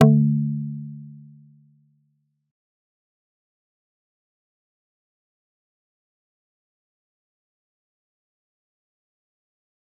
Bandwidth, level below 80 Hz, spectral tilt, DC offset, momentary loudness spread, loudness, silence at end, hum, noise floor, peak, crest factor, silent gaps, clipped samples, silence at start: 3.7 kHz; -74 dBFS; -9.5 dB/octave; under 0.1%; 23 LU; -22 LUFS; 8.85 s; none; -70 dBFS; -2 dBFS; 28 dB; none; under 0.1%; 0 s